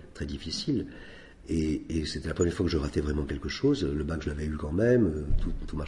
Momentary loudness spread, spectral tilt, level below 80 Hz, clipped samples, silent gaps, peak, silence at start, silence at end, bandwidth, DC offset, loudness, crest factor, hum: 11 LU; -6.5 dB/octave; -38 dBFS; under 0.1%; none; -12 dBFS; 0 s; 0 s; 11.5 kHz; under 0.1%; -30 LUFS; 16 dB; none